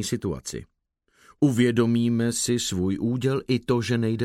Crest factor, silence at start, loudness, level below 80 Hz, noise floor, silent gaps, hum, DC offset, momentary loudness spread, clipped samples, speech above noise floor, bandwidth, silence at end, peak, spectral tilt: 16 dB; 0 s; -24 LUFS; -54 dBFS; -65 dBFS; none; none; under 0.1%; 9 LU; under 0.1%; 41 dB; 15.5 kHz; 0 s; -8 dBFS; -5.5 dB/octave